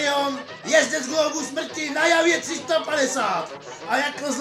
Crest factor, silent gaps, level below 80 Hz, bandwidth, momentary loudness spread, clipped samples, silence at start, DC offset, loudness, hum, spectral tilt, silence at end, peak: 20 dB; none; -72 dBFS; 15 kHz; 9 LU; under 0.1%; 0 s; under 0.1%; -22 LUFS; none; -1.5 dB/octave; 0 s; -4 dBFS